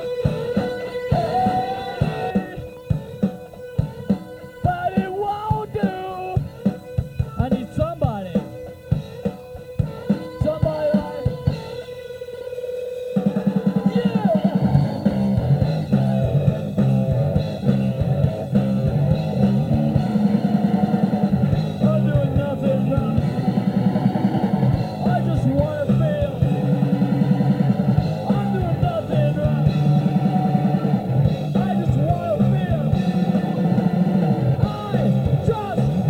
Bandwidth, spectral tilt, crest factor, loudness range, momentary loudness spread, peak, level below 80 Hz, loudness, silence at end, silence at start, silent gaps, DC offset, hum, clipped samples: 9.6 kHz; -9 dB/octave; 16 dB; 5 LU; 8 LU; -4 dBFS; -38 dBFS; -21 LUFS; 0 s; 0 s; none; under 0.1%; none; under 0.1%